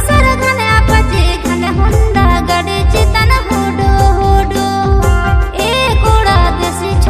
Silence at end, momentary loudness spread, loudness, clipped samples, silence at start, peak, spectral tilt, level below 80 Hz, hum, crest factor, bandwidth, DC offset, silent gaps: 0 s; 4 LU; -11 LUFS; 0.2%; 0 s; 0 dBFS; -5.5 dB/octave; -14 dBFS; none; 10 dB; 15 kHz; under 0.1%; none